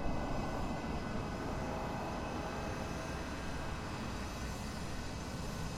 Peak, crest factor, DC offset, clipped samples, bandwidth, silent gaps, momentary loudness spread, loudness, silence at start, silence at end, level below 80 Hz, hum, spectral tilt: -24 dBFS; 16 dB; under 0.1%; under 0.1%; 16 kHz; none; 3 LU; -41 LUFS; 0 s; 0 s; -46 dBFS; none; -5.5 dB/octave